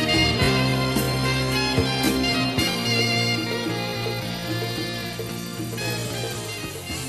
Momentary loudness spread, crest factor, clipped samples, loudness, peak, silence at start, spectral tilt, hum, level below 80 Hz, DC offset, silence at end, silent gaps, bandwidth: 10 LU; 16 dB; under 0.1%; -23 LUFS; -8 dBFS; 0 s; -4 dB/octave; none; -40 dBFS; under 0.1%; 0 s; none; 13 kHz